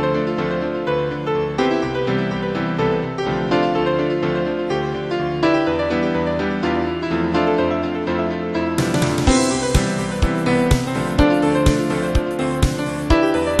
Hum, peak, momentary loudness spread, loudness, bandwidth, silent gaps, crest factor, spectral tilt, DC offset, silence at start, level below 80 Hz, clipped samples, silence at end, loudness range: none; -2 dBFS; 5 LU; -19 LUFS; 13 kHz; none; 18 dB; -5.5 dB/octave; 0.2%; 0 s; -30 dBFS; under 0.1%; 0 s; 3 LU